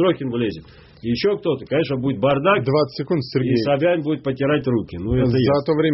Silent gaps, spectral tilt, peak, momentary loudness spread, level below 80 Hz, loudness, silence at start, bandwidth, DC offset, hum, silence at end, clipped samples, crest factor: none; -6 dB/octave; -4 dBFS; 6 LU; -44 dBFS; -20 LUFS; 0 s; 6 kHz; under 0.1%; none; 0 s; under 0.1%; 14 dB